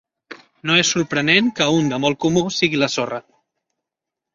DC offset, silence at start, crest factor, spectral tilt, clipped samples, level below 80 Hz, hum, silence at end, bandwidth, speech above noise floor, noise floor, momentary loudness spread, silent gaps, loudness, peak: under 0.1%; 0.3 s; 18 dB; -3.5 dB/octave; under 0.1%; -56 dBFS; none; 1.15 s; 7.6 kHz; 66 dB; -85 dBFS; 9 LU; none; -17 LUFS; -2 dBFS